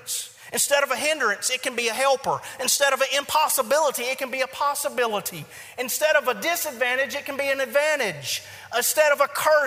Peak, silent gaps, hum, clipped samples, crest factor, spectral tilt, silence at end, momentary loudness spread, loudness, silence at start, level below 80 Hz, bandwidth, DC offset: -4 dBFS; none; none; under 0.1%; 20 dB; -0.5 dB/octave; 0 s; 9 LU; -23 LUFS; 0 s; -70 dBFS; 16 kHz; under 0.1%